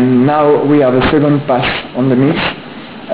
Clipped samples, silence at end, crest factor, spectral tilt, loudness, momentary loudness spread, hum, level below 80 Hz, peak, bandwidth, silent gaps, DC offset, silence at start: under 0.1%; 0 s; 10 dB; -11 dB/octave; -11 LUFS; 11 LU; none; -36 dBFS; -2 dBFS; 4 kHz; none; 0.6%; 0 s